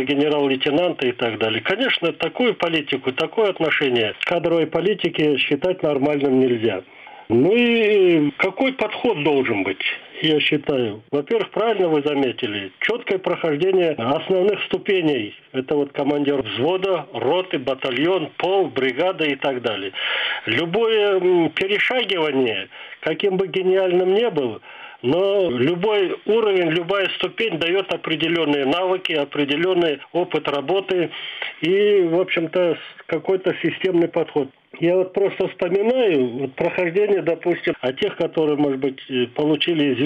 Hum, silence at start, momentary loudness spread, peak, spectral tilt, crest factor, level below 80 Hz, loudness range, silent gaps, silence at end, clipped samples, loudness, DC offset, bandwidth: none; 0 s; 6 LU; -6 dBFS; -7 dB/octave; 14 dB; -62 dBFS; 3 LU; none; 0 s; under 0.1%; -20 LUFS; under 0.1%; 8 kHz